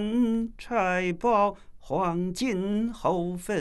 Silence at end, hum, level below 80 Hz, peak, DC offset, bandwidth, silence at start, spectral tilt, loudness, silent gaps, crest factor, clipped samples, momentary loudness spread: 0 s; none; -48 dBFS; -10 dBFS; under 0.1%; 12.5 kHz; 0 s; -6 dB/octave; -27 LUFS; none; 16 dB; under 0.1%; 6 LU